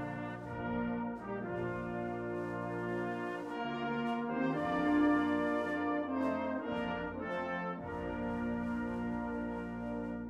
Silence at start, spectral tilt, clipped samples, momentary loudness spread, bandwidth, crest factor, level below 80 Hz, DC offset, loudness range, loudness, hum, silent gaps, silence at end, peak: 0 s; -7.5 dB/octave; under 0.1%; 8 LU; 9.4 kHz; 16 dB; -58 dBFS; under 0.1%; 5 LU; -36 LUFS; none; none; 0 s; -20 dBFS